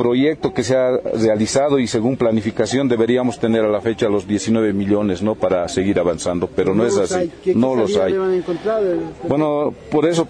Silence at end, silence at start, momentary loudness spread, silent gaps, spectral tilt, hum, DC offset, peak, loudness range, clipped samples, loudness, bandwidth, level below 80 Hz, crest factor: 0 s; 0 s; 4 LU; none; -5.5 dB/octave; none; under 0.1%; -4 dBFS; 1 LU; under 0.1%; -18 LUFS; 10.5 kHz; -48 dBFS; 12 dB